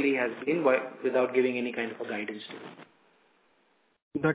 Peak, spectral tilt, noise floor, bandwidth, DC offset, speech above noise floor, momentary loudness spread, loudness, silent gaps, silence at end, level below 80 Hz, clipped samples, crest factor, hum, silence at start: -10 dBFS; -9.5 dB/octave; -69 dBFS; 4 kHz; under 0.1%; 40 dB; 16 LU; -29 LUFS; 4.02-4.11 s; 0 s; -72 dBFS; under 0.1%; 20 dB; none; 0 s